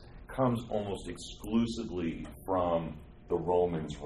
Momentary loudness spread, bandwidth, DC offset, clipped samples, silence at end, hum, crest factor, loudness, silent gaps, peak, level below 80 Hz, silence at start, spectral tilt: 13 LU; 13 kHz; under 0.1%; under 0.1%; 0 s; none; 18 dB; -33 LUFS; none; -16 dBFS; -50 dBFS; 0 s; -7 dB/octave